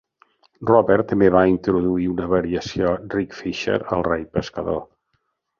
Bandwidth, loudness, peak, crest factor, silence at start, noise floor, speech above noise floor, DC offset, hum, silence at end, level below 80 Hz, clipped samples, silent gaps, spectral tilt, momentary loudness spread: 7.2 kHz; -20 LUFS; -2 dBFS; 18 dB; 0.6 s; -71 dBFS; 52 dB; under 0.1%; none; 0.75 s; -44 dBFS; under 0.1%; none; -7 dB/octave; 11 LU